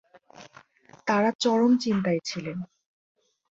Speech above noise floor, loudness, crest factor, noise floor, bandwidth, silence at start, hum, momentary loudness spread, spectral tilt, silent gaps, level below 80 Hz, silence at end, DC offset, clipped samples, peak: 30 dB; -25 LUFS; 18 dB; -55 dBFS; 8 kHz; 0.4 s; none; 14 LU; -5.5 dB/octave; 1.35-1.39 s; -68 dBFS; 0.85 s; under 0.1%; under 0.1%; -10 dBFS